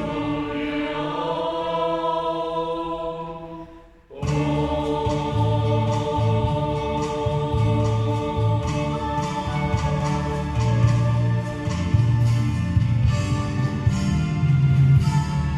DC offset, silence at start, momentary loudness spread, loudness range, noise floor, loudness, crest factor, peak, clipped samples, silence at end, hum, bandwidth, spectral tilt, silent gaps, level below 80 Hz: under 0.1%; 0 s; 7 LU; 5 LU; -45 dBFS; -22 LUFS; 14 dB; -6 dBFS; under 0.1%; 0 s; none; 10.5 kHz; -7.5 dB/octave; none; -36 dBFS